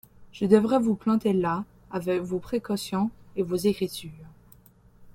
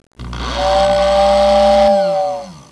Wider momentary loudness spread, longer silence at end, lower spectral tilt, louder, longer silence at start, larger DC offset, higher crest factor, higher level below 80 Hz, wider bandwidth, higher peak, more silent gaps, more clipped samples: second, 11 LU vs 14 LU; about the same, 0.05 s vs 0.15 s; first, -6.5 dB/octave vs -4.5 dB/octave; second, -26 LUFS vs -13 LUFS; about the same, 0.2 s vs 0.2 s; neither; first, 22 dB vs 12 dB; second, -58 dBFS vs -30 dBFS; first, 16.5 kHz vs 11 kHz; second, -6 dBFS vs -2 dBFS; neither; neither